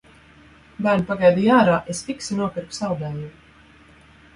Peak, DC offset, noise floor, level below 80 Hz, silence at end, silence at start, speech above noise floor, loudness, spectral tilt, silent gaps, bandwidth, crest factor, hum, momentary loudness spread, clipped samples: -4 dBFS; under 0.1%; -50 dBFS; -54 dBFS; 1.05 s; 0.8 s; 30 dB; -21 LUFS; -6 dB/octave; none; 11.5 kHz; 18 dB; none; 14 LU; under 0.1%